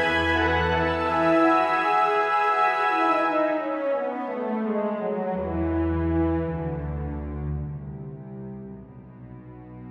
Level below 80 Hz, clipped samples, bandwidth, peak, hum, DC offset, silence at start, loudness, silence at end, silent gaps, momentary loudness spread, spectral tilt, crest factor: -40 dBFS; under 0.1%; 9.8 kHz; -8 dBFS; none; under 0.1%; 0 s; -24 LUFS; 0 s; none; 18 LU; -7 dB/octave; 16 dB